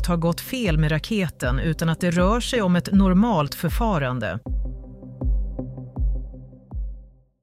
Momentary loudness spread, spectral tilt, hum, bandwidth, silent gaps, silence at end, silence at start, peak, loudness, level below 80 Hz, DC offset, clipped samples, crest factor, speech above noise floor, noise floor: 16 LU; -6.5 dB/octave; none; 16 kHz; none; 0.35 s; 0 s; -8 dBFS; -23 LUFS; -30 dBFS; under 0.1%; under 0.1%; 14 dB; 23 dB; -44 dBFS